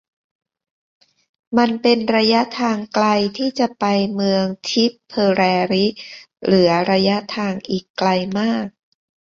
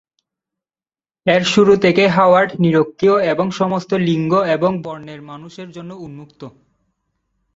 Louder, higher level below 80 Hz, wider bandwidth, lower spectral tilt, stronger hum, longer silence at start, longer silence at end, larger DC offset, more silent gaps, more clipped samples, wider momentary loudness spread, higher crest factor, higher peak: second, -18 LUFS vs -15 LUFS; about the same, -58 dBFS vs -56 dBFS; about the same, 7.4 kHz vs 8 kHz; about the same, -5.5 dB/octave vs -6 dB/octave; neither; first, 1.5 s vs 1.25 s; second, 0.65 s vs 1.05 s; neither; first, 7.90-7.94 s vs none; neither; second, 8 LU vs 21 LU; about the same, 18 dB vs 16 dB; about the same, -2 dBFS vs -2 dBFS